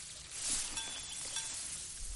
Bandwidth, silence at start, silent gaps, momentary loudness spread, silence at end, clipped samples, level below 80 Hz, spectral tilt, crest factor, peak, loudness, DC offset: 11.5 kHz; 0 s; none; 6 LU; 0 s; under 0.1%; -54 dBFS; 0.5 dB/octave; 18 dB; -22 dBFS; -38 LUFS; under 0.1%